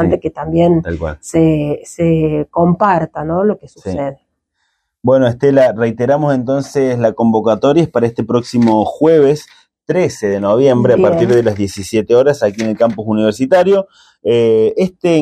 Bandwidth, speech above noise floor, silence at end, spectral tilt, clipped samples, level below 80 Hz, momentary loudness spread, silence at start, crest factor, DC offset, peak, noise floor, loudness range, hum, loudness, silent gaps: 14 kHz; 54 dB; 0 s; -7 dB/octave; under 0.1%; -42 dBFS; 8 LU; 0 s; 12 dB; under 0.1%; 0 dBFS; -67 dBFS; 3 LU; none; -13 LUFS; none